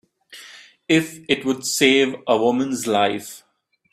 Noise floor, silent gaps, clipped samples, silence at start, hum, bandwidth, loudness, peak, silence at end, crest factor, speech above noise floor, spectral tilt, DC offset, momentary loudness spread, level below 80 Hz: -45 dBFS; none; under 0.1%; 0.3 s; none; 16 kHz; -19 LUFS; -2 dBFS; 0.55 s; 20 dB; 25 dB; -3.5 dB/octave; under 0.1%; 23 LU; -64 dBFS